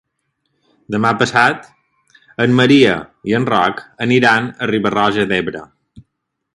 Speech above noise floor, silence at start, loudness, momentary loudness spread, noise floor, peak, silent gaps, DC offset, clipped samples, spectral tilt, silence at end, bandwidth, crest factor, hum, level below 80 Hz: 60 dB; 0.9 s; -15 LUFS; 12 LU; -74 dBFS; 0 dBFS; none; under 0.1%; under 0.1%; -5.5 dB/octave; 0.55 s; 11.5 kHz; 16 dB; none; -52 dBFS